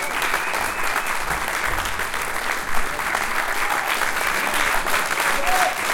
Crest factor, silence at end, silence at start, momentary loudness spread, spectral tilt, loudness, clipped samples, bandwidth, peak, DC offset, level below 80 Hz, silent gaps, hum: 18 dB; 0 s; 0 s; 5 LU; -1 dB/octave; -21 LUFS; under 0.1%; 17 kHz; -4 dBFS; under 0.1%; -38 dBFS; none; none